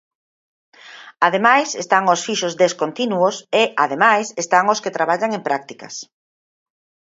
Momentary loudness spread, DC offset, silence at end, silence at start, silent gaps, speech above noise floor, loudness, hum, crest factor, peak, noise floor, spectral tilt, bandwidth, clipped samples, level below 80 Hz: 9 LU; under 0.1%; 1 s; 0.85 s; none; over 72 dB; -17 LUFS; none; 20 dB; 0 dBFS; under -90 dBFS; -3 dB/octave; 8 kHz; under 0.1%; -72 dBFS